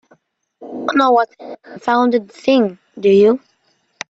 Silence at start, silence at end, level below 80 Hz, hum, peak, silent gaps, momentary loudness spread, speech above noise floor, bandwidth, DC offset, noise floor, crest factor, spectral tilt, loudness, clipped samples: 0.6 s; 0.7 s; -64 dBFS; none; -2 dBFS; none; 14 LU; 48 dB; 7.8 kHz; under 0.1%; -62 dBFS; 14 dB; -6 dB/octave; -16 LUFS; under 0.1%